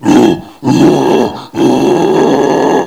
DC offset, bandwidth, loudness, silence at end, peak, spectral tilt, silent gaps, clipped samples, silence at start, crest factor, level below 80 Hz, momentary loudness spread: 0.3%; 16 kHz; -10 LUFS; 0 s; 0 dBFS; -6 dB/octave; none; 1%; 0 s; 8 dB; -44 dBFS; 5 LU